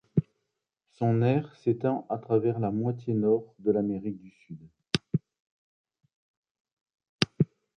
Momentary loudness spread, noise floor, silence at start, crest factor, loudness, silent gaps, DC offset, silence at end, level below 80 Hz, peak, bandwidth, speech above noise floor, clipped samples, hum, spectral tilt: 12 LU; -83 dBFS; 0.15 s; 28 dB; -29 LUFS; 5.40-5.85 s, 6.13-6.43 s, 6.51-6.65 s, 6.72-6.86 s, 7.09-7.19 s; under 0.1%; 0.3 s; -62 dBFS; -2 dBFS; 11 kHz; 55 dB; under 0.1%; none; -7 dB/octave